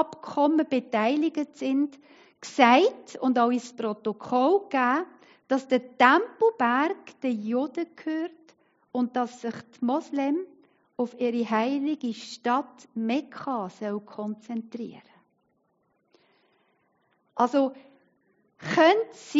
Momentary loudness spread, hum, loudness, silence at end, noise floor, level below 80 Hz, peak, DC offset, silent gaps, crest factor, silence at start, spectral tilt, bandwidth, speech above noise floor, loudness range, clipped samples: 15 LU; none; -26 LUFS; 0 s; -71 dBFS; -82 dBFS; -2 dBFS; under 0.1%; none; 24 dB; 0 s; -2.5 dB/octave; 7.6 kHz; 46 dB; 10 LU; under 0.1%